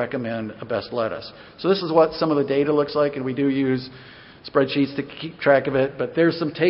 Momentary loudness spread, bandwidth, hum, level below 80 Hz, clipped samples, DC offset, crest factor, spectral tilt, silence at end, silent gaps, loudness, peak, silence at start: 12 LU; 5.8 kHz; none; -58 dBFS; under 0.1%; under 0.1%; 18 dB; -11 dB/octave; 0 s; none; -22 LUFS; -4 dBFS; 0 s